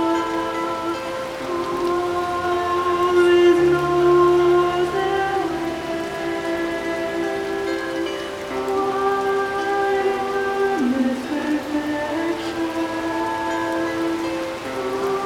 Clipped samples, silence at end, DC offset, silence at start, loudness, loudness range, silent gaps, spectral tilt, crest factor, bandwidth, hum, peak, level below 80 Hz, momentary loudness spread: under 0.1%; 0 s; under 0.1%; 0 s; -21 LUFS; 7 LU; none; -5 dB/octave; 14 dB; 15 kHz; none; -6 dBFS; -50 dBFS; 10 LU